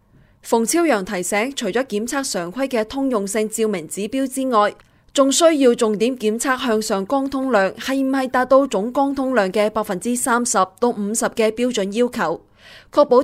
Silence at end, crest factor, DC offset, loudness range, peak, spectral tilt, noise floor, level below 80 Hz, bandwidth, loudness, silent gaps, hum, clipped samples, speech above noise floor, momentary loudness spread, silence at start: 0 s; 18 dB; under 0.1%; 3 LU; -2 dBFS; -3.5 dB/octave; -43 dBFS; -54 dBFS; 16 kHz; -19 LUFS; none; none; under 0.1%; 24 dB; 7 LU; 0.45 s